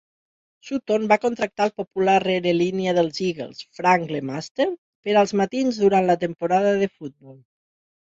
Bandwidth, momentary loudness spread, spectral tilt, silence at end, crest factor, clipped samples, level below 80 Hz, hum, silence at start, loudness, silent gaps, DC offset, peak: 7.8 kHz; 11 LU; -5.5 dB/octave; 0.7 s; 18 dB; under 0.1%; -64 dBFS; none; 0.65 s; -22 LUFS; 4.51-4.55 s, 4.78-5.03 s; under 0.1%; -4 dBFS